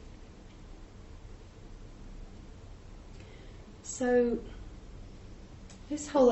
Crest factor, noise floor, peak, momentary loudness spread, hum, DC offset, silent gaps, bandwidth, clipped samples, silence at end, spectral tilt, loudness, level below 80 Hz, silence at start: 22 dB; -50 dBFS; -14 dBFS; 24 LU; none; under 0.1%; none; 8.4 kHz; under 0.1%; 0 s; -5 dB/octave; -31 LUFS; -50 dBFS; 0 s